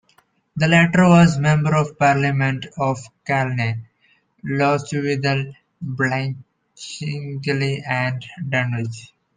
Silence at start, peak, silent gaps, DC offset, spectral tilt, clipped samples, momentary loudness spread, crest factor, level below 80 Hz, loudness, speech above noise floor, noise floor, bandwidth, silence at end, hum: 0.55 s; -2 dBFS; none; under 0.1%; -6.5 dB/octave; under 0.1%; 18 LU; 18 dB; -54 dBFS; -19 LUFS; 42 dB; -60 dBFS; 9.6 kHz; 0.3 s; none